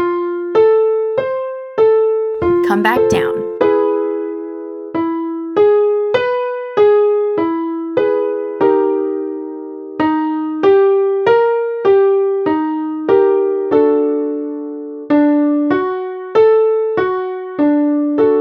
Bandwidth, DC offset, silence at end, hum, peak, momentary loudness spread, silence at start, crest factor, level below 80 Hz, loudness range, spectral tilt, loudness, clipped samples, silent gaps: 12 kHz; under 0.1%; 0 s; none; 0 dBFS; 11 LU; 0 s; 14 dB; -54 dBFS; 2 LU; -6.5 dB/octave; -15 LUFS; under 0.1%; none